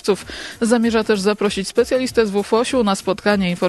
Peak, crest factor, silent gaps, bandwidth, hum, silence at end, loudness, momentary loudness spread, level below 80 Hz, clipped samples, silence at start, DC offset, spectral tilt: -4 dBFS; 14 dB; none; 13 kHz; none; 0 s; -18 LUFS; 5 LU; -46 dBFS; under 0.1%; 0.05 s; under 0.1%; -5 dB/octave